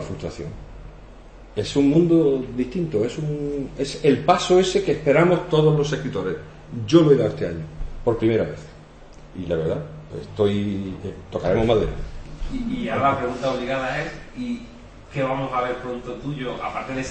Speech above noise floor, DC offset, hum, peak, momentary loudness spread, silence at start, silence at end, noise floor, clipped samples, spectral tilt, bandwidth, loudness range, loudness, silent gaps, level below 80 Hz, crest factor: 22 dB; under 0.1%; none; -2 dBFS; 17 LU; 0 s; 0 s; -43 dBFS; under 0.1%; -6.5 dB/octave; 8.8 kHz; 7 LU; -22 LUFS; none; -40 dBFS; 20 dB